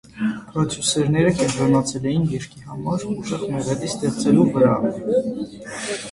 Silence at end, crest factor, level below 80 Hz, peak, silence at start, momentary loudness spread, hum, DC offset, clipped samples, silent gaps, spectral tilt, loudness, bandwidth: 0 s; 18 dB; -50 dBFS; -4 dBFS; 0.15 s; 12 LU; none; under 0.1%; under 0.1%; none; -5.5 dB/octave; -21 LUFS; 11.5 kHz